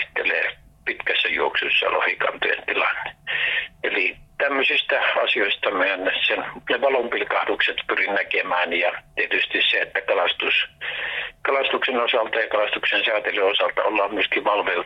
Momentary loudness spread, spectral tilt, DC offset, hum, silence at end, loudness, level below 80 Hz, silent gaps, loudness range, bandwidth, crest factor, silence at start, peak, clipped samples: 6 LU; -4 dB/octave; under 0.1%; none; 0 s; -21 LUFS; -58 dBFS; none; 1 LU; 8.4 kHz; 14 dB; 0 s; -10 dBFS; under 0.1%